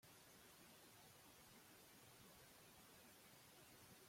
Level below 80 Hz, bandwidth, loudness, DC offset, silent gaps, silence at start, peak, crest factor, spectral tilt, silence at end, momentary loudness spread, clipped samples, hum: -86 dBFS; 16.5 kHz; -65 LUFS; under 0.1%; none; 0 s; -52 dBFS; 14 dB; -2.5 dB/octave; 0 s; 0 LU; under 0.1%; none